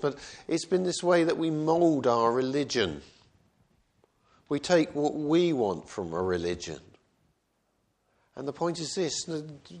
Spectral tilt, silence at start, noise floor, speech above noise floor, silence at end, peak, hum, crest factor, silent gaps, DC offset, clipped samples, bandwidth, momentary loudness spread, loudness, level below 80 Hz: -5 dB/octave; 0 s; -74 dBFS; 47 dB; 0 s; -10 dBFS; none; 20 dB; none; under 0.1%; under 0.1%; 10 kHz; 13 LU; -28 LUFS; -62 dBFS